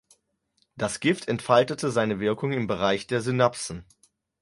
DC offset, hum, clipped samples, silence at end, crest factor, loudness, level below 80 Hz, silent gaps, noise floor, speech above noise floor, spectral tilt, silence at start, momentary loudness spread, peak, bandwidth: under 0.1%; none; under 0.1%; 0.6 s; 20 dB; -25 LUFS; -58 dBFS; none; -71 dBFS; 46 dB; -5 dB/octave; 0.75 s; 10 LU; -6 dBFS; 11.5 kHz